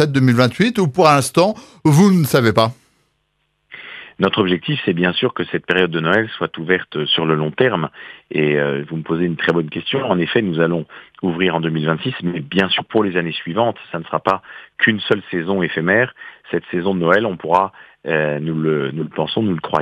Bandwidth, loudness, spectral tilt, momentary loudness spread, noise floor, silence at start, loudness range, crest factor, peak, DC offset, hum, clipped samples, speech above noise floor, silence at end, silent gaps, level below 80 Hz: 14.5 kHz; -17 LUFS; -6 dB/octave; 10 LU; -67 dBFS; 0 s; 3 LU; 18 dB; 0 dBFS; under 0.1%; none; under 0.1%; 50 dB; 0 s; none; -60 dBFS